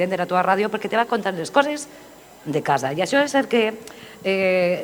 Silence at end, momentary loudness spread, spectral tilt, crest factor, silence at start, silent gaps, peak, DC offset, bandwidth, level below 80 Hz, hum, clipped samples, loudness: 0 s; 12 LU; -4.5 dB/octave; 20 dB; 0 s; none; -2 dBFS; under 0.1%; 19.5 kHz; -64 dBFS; none; under 0.1%; -21 LUFS